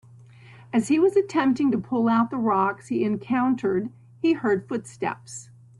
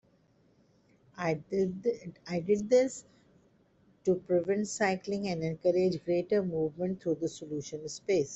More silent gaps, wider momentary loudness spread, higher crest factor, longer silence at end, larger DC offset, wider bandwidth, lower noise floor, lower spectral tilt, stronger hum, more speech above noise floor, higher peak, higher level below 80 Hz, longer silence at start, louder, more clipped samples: neither; about the same, 10 LU vs 11 LU; about the same, 14 dB vs 18 dB; first, 0.35 s vs 0 s; neither; first, 12 kHz vs 8.2 kHz; second, -48 dBFS vs -67 dBFS; about the same, -6 dB/octave vs -6 dB/octave; neither; second, 25 dB vs 36 dB; first, -10 dBFS vs -14 dBFS; about the same, -64 dBFS vs -68 dBFS; second, 0.5 s vs 1.15 s; first, -24 LUFS vs -31 LUFS; neither